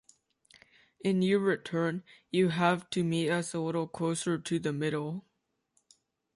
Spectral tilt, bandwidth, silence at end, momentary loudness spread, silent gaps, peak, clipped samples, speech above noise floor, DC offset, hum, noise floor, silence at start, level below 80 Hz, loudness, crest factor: -5.5 dB/octave; 11.5 kHz; 1.15 s; 8 LU; none; -14 dBFS; under 0.1%; 46 dB; under 0.1%; none; -76 dBFS; 1.05 s; -72 dBFS; -31 LUFS; 18 dB